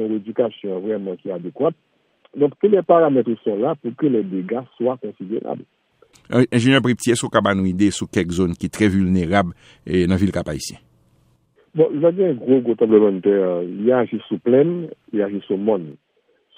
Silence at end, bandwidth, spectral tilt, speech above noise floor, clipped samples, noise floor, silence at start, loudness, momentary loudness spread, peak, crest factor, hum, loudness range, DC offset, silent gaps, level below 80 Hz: 0.65 s; 15 kHz; -6.5 dB/octave; 43 dB; under 0.1%; -62 dBFS; 0 s; -19 LUFS; 12 LU; 0 dBFS; 18 dB; none; 3 LU; under 0.1%; none; -52 dBFS